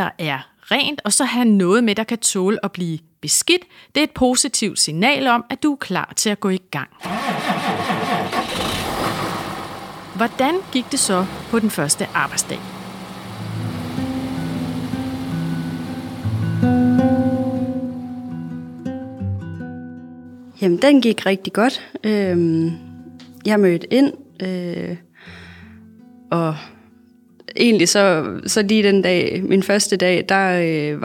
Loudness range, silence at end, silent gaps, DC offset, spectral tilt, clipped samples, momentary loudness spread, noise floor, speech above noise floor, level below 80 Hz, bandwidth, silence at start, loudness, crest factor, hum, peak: 8 LU; 0 s; none; under 0.1%; -4 dB/octave; under 0.1%; 15 LU; -50 dBFS; 32 dB; -52 dBFS; 17 kHz; 0 s; -19 LUFS; 18 dB; none; -2 dBFS